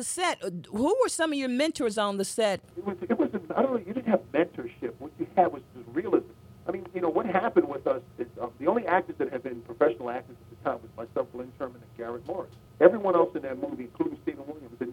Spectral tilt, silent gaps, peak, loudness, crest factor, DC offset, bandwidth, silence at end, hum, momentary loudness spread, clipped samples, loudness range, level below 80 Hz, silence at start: -4.5 dB/octave; none; -4 dBFS; -29 LUFS; 24 dB; under 0.1%; 16 kHz; 0 s; none; 13 LU; under 0.1%; 2 LU; -64 dBFS; 0 s